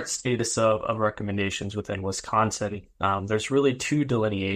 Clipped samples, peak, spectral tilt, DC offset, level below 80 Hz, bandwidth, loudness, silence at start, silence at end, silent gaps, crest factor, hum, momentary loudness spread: under 0.1%; -8 dBFS; -4.5 dB/octave; under 0.1%; -50 dBFS; 15.5 kHz; -26 LUFS; 0 s; 0 s; none; 18 dB; none; 7 LU